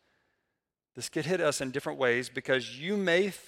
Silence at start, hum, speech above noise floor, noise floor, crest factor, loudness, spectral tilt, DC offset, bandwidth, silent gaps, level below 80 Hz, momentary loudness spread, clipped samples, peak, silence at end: 0.95 s; none; 56 dB; -86 dBFS; 18 dB; -30 LUFS; -4 dB/octave; under 0.1%; 16.5 kHz; none; -72 dBFS; 8 LU; under 0.1%; -12 dBFS; 0 s